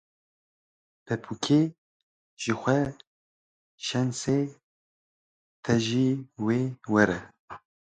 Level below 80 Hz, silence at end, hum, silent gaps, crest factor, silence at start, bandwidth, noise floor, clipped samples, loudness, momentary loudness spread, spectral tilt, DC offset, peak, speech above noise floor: -60 dBFS; 0.35 s; none; 1.78-2.37 s, 3.07-3.78 s, 4.63-5.63 s, 7.39-7.48 s; 24 dB; 1.1 s; 9.4 kHz; under -90 dBFS; under 0.1%; -27 LUFS; 12 LU; -5.5 dB/octave; under 0.1%; -6 dBFS; over 64 dB